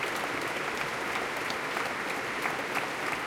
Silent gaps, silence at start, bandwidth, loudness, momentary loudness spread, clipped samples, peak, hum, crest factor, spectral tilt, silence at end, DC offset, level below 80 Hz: none; 0 s; 17 kHz; -31 LUFS; 1 LU; under 0.1%; -16 dBFS; none; 18 dB; -2.5 dB/octave; 0 s; under 0.1%; -64 dBFS